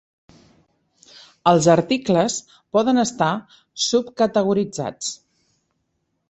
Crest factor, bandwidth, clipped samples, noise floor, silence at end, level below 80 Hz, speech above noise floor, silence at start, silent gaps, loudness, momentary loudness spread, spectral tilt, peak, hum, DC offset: 20 dB; 8.6 kHz; under 0.1%; -72 dBFS; 1.15 s; -60 dBFS; 53 dB; 1.45 s; none; -20 LUFS; 13 LU; -4.5 dB/octave; -2 dBFS; none; under 0.1%